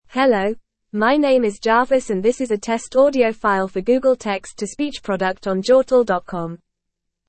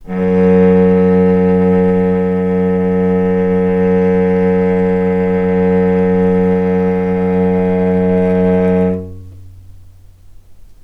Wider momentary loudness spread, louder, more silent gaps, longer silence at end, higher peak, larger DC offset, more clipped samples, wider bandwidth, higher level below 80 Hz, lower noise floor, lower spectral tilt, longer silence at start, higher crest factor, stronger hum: first, 10 LU vs 4 LU; second, -19 LUFS vs -13 LUFS; neither; first, 0.7 s vs 0.1 s; second, -4 dBFS vs 0 dBFS; neither; neither; first, 8.8 kHz vs 3.8 kHz; second, -50 dBFS vs -40 dBFS; first, -78 dBFS vs -38 dBFS; second, -5 dB/octave vs -10.5 dB/octave; about the same, 0.1 s vs 0 s; about the same, 16 dB vs 12 dB; neither